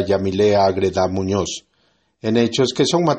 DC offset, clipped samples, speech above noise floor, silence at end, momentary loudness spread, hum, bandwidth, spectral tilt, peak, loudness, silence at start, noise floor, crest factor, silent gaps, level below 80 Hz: under 0.1%; under 0.1%; 46 dB; 0 s; 9 LU; none; 8.8 kHz; -5 dB/octave; -2 dBFS; -18 LUFS; 0 s; -63 dBFS; 16 dB; none; -52 dBFS